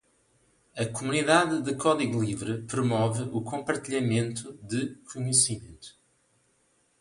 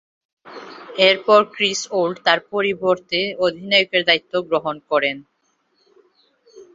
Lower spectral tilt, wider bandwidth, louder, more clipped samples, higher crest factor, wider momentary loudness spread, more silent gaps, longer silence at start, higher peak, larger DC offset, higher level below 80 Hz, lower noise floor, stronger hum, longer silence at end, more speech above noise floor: about the same, -4 dB/octave vs -3 dB/octave; first, 11.5 kHz vs 7.8 kHz; second, -27 LUFS vs -18 LUFS; neither; about the same, 22 dB vs 20 dB; first, 13 LU vs 10 LU; neither; first, 0.75 s vs 0.45 s; second, -8 dBFS vs -2 dBFS; neither; about the same, -62 dBFS vs -66 dBFS; about the same, -69 dBFS vs -66 dBFS; neither; first, 1.1 s vs 0.1 s; second, 41 dB vs 47 dB